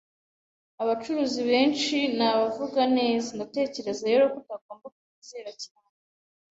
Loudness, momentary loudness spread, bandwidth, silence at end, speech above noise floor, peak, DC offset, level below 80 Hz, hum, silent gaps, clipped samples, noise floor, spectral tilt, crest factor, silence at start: -25 LUFS; 19 LU; 8 kHz; 0.85 s; over 64 dB; -10 dBFS; under 0.1%; -72 dBFS; none; 4.61-4.69 s, 4.92-5.22 s; under 0.1%; under -90 dBFS; -3.5 dB/octave; 18 dB; 0.8 s